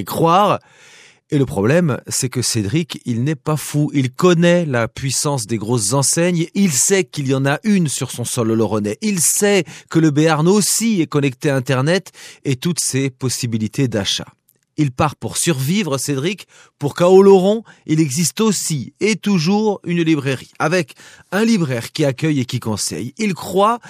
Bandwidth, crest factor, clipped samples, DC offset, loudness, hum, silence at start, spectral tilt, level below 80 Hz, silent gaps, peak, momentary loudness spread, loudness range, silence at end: 15.5 kHz; 16 dB; under 0.1%; under 0.1%; -17 LUFS; none; 0 s; -4.5 dB/octave; -56 dBFS; none; 0 dBFS; 8 LU; 4 LU; 0 s